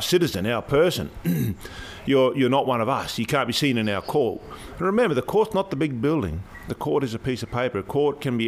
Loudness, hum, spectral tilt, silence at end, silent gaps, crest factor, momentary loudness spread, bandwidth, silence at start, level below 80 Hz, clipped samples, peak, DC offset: -23 LUFS; none; -5.5 dB/octave; 0 s; none; 16 dB; 10 LU; 16 kHz; 0 s; -48 dBFS; under 0.1%; -8 dBFS; under 0.1%